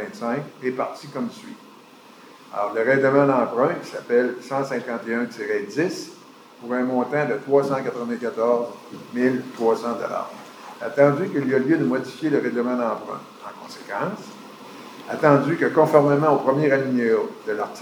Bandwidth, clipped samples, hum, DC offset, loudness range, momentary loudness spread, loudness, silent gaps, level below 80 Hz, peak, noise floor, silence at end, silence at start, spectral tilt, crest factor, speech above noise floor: 19.5 kHz; under 0.1%; none; under 0.1%; 5 LU; 19 LU; -22 LUFS; none; -82 dBFS; -2 dBFS; -47 dBFS; 0 s; 0 s; -7 dB/octave; 22 dB; 25 dB